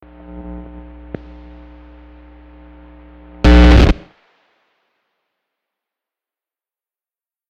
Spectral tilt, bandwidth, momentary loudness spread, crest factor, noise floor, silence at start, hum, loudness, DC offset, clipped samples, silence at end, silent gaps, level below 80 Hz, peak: -7 dB/octave; 7.6 kHz; 28 LU; 18 dB; under -90 dBFS; 0.35 s; none; -11 LUFS; under 0.1%; under 0.1%; 3.55 s; none; -20 dBFS; 0 dBFS